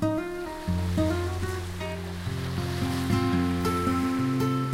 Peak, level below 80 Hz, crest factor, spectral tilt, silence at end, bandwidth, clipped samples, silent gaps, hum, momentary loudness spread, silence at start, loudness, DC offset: -12 dBFS; -44 dBFS; 14 dB; -6.5 dB/octave; 0 s; 16 kHz; under 0.1%; none; none; 8 LU; 0 s; -28 LUFS; under 0.1%